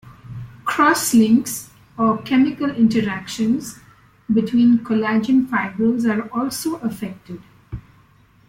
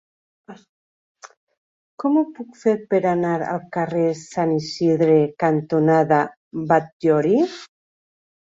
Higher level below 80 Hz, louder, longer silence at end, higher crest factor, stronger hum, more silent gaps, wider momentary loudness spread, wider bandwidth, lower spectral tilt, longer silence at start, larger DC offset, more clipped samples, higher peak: first, -52 dBFS vs -64 dBFS; about the same, -19 LUFS vs -20 LUFS; about the same, 0.7 s vs 0.8 s; about the same, 16 dB vs 18 dB; neither; second, none vs 0.69-1.15 s, 1.37-1.47 s, 1.57-1.98 s, 6.37-6.51 s, 6.92-7.00 s; first, 21 LU vs 8 LU; first, 16.5 kHz vs 7.8 kHz; second, -5 dB/octave vs -7 dB/octave; second, 0.05 s vs 0.5 s; neither; neither; about the same, -4 dBFS vs -2 dBFS